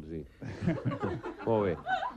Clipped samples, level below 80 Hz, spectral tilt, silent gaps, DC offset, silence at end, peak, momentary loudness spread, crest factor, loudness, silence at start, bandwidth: under 0.1%; -56 dBFS; -8 dB/octave; none; under 0.1%; 0 s; -18 dBFS; 12 LU; 16 dB; -33 LUFS; 0 s; 9 kHz